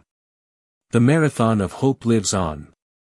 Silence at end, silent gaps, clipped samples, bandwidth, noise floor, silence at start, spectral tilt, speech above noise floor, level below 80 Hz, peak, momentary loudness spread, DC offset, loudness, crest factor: 0.45 s; none; under 0.1%; 12 kHz; under -90 dBFS; 0.95 s; -6 dB/octave; over 72 dB; -50 dBFS; -4 dBFS; 7 LU; under 0.1%; -19 LUFS; 16 dB